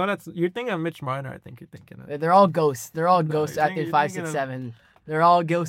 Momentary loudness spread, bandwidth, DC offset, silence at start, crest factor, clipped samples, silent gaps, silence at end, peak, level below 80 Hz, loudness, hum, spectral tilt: 15 LU; 16.5 kHz; under 0.1%; 0 s; 18 dB; under 0.1%; none; 0 s; -4 dBFS; -68 dBFS; -23 LUFS; none; -6 dB/octave